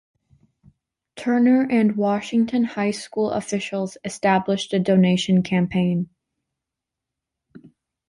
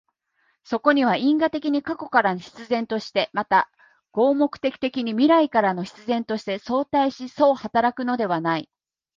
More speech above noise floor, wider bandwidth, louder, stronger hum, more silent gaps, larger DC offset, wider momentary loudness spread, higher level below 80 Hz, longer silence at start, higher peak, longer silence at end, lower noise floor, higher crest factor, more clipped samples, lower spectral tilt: first, 65 dB vs 47 dB; first, 11.5 kHz vs 7.4 kHz; about the same, -21 LUFS vs -22 LUFS; neither; neither; neither; about the same, 9 LU vs 8 LU; about the same, -60 dBFS vs -64 dBFS; first, 1.15 s vs 0.7 s; about the same, -6 dBFS vs -4 dBFS; about the same, 0.5 s vs 0.5 s; first, -85 dBFS vs -69 dBFS; about the same, 16 dB vs 18 dB; neither; about the same, -6.5 dB/octave vs -6 dB/octave